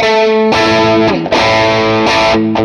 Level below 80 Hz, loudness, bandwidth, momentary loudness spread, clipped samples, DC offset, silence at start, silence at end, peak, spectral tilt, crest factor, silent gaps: -38 dBFS; -10 LUFS; 11.5 kHz; 2 LU; under 0.1%; under 0.1%; 0 s; 0 s; 0 dBFS; -5 dB/octave; 10 dB; none